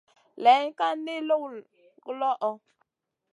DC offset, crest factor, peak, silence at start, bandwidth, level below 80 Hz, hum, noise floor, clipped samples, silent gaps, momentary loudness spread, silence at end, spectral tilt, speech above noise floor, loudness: under 0.1%; 20 dB; -8 dBFS; 0.35 s; 10.5 kHz; under -90 dBFS; none; -84 dBFS; under 0.1%; none; 23 LU; 0.75 s; -3.5 dB/octave; 59 dB; -26 LUFS